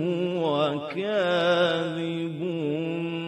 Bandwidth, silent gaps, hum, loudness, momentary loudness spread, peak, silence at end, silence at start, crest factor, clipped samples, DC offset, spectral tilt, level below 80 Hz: 10.5 kHz; none; none; -26 LUFS; 8 LU; -12 dBFS; 0 s; 0 s; 14 dB; under 0.1%; under 0.1%; -6.5 dB/octave; -74 dBFS